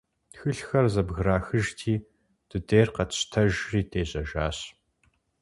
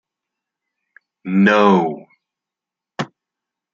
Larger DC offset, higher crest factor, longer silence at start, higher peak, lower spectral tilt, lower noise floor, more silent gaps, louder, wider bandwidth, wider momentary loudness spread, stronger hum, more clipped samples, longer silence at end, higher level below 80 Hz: neither; about the same, 20 dB vs 20 dB; second, 0.35 s vs 1.25 s; second, -6 dBFS vs 0 dBFS; second, -5.5 dB/octave vs -7 dB/octave; second, -69 dBFS vs -87 dBFS; neither; second, -27 LUFS vs -15 LUFS; first, 11.5 kHz vs 7.2 kHz; second, 11 LU vs 22 LU; neither; neither; about the same, 0.7 s vs 0.7 s; first, -42 dBFS vs -64 dBFS